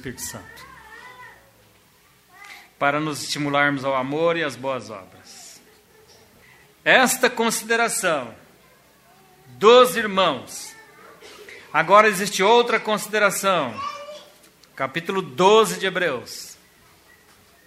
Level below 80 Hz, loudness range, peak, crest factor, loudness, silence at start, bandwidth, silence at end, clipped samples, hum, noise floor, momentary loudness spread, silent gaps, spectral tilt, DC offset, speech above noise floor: -64 dBFS; 6 LU; 0 dBFS; 22 dB; -20 LUFS; 0.05 s; 16 kHz; 1.15 s; under 0.1%; none; -56 dBFS; 26 LU; none; -3 dB/octave; under 0.1%; 36 dB